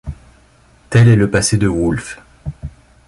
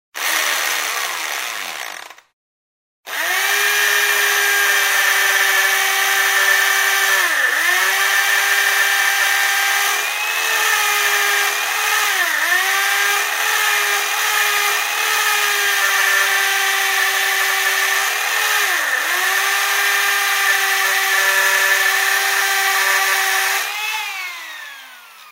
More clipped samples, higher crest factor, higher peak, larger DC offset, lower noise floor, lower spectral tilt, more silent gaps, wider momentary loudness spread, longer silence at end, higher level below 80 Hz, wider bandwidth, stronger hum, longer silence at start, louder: neither; about the same, 14 dB vs 14 dB; about the same, -2 dBFS vs -2 dBFS; neither; first, -49 dBFS vs -40 dBFS; first, -6 dB/octave vs 4 dB/octave; second, none vs 2.33-3.03 s; first, 22 LU vs 7 LU; first, 0.4 s vs 0 s; first, -34 dBFS vs -80 dBFS; second, 11.5 kHz vs 16.5 kHz; neither; about the same, 0.05 s vs 0.15 s; about the same, -14 LUFS vs -15 LUFS